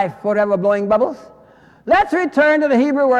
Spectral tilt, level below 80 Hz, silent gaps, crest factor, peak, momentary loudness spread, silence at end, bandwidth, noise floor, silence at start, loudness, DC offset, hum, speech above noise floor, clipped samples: -6.5 dB/octave; -50 dBFS; none; 12 dB; -4 dBFS; 7 LU; 0 s; 9.8 kHz; -47 dBFS; 0 s; -16 LUFS; under 0.1%; none; 32 dB; under 0.1%